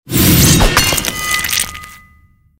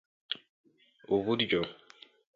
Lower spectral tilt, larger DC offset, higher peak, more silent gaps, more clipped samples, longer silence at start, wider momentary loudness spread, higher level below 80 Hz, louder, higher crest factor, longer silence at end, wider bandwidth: second, -3 dB/octave vs -6.5 dB/octave; neither; first, 0 dBFS vs -16 dBFS; second, none vs 0.49-0.64 s; neither; second, 0.05 s vs 0.3 s; about the same, 10 LU vs 11 LU; first, -24 dBFS vs -68 dBFS; first, -11 LUFS vs -32 LUFS; second, 14 dB vs 20 dB; about the same, 0.65 s vs 0.6 s; first, 16.5 kHz vs 7.2 kHz